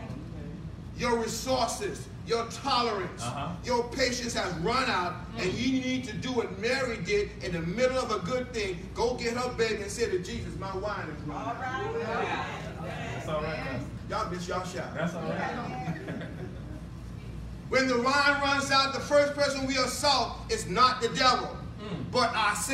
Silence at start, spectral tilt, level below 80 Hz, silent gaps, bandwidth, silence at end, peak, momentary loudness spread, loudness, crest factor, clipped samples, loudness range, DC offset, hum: 0 s; -4 dB/octave; -48 dBFS; none; 16 kHz; 0 s; -10 dBFS; 14 LU; -29 LUFS; 20 dB; under 0.1%; 8 LU; under 0.1%; none